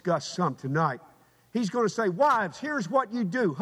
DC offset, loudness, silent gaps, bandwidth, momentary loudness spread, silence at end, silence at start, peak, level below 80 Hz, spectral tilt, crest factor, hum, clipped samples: under 0.1%; -27 LUFS; none; 13.5 kHz; 8 LU; 0 s; 0.05 s; -12 dBFS; -74 dBFS; -6 dB/octave; 16 dB; none; under 0.1%